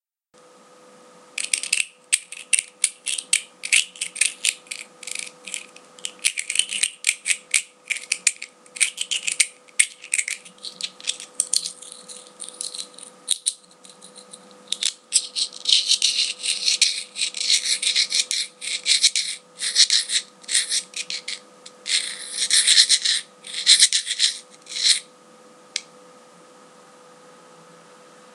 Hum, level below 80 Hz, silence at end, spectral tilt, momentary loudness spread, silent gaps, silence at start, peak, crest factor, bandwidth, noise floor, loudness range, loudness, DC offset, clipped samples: none; -88 dBFS; 2.5 s; 4 dB/octave; 17 LU; none; 1.35 s; 0 dBFS; 24 dB; 14.5 kHz; -55 dBFS; 9 LU; -20 LUFS; under 0.1%; under 0.1%